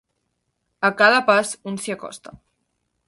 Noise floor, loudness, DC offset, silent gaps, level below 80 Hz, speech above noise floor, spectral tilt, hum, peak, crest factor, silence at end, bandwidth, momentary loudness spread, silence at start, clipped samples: -74 dBFS; -19 LUFS; under 0.1%; none; -66 dBFS; 54 dB; -3 dB/octave; none; -2 dBFS; 20 dB; 0.7 s; 11.5 kHz; 19 LU; 0.8 s; under 0.1%